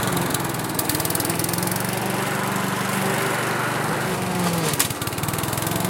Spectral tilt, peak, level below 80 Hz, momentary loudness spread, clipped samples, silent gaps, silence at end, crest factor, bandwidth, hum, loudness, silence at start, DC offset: -3.5 dB/octave; -2 dBFS; -50 dBFS; 2 LU; under 0.1%; none; 0 s; 22 dB; 17.5 kHz; none; -23 LUFS; 0 s; under 0.1%